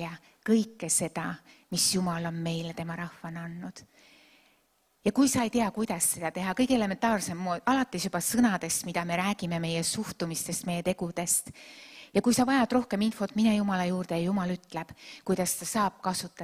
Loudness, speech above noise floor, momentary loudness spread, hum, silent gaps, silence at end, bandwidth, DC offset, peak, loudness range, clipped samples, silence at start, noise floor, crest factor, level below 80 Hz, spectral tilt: -29 LUFS; 41 dB; 14 LU; none; none; 0 s; 16 kHz; under 0.1%; -12 dBFS; 5 LU; under 0.1%; 0 s; -70 dBFS; 18 dB; -60 dBFS; -4 dB/octave